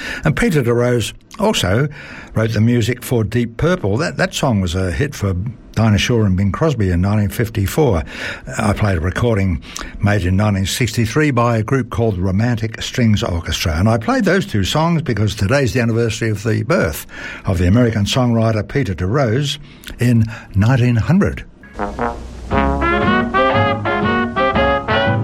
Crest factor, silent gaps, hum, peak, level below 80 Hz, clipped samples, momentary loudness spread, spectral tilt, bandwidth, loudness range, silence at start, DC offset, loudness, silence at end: 14 dB; none; none; -2 dBFS; -32 dBFS; under 0.1%; 7 LU; -6 dB/octave; 16 kHz; 1 LU; 0 s; under 0.1%; -17 LUFS; 0 s